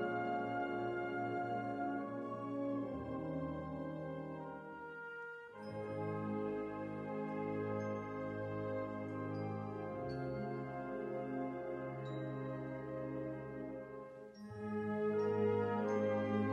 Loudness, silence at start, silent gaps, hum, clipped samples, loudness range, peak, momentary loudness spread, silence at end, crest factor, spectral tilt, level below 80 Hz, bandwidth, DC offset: -42 LUFS; 0 s; none; none; under 0.1%; 4 LU; -24 dBFS; 11 LU; 0 s; 16 dB; -8.5 dB/octave; -68 dBFS; 9.4 kHz; under 0.1%